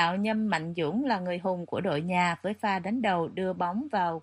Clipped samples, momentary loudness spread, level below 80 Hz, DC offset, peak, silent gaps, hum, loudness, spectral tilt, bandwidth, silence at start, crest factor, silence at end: under 0.1%; 4 LU; -70 dBFS; under 0.1%; -12 dBFS; none; none; -29 LUFS; -6.5 dB/octave; 11.5 kHz; 0 s; 18 dB; 0 s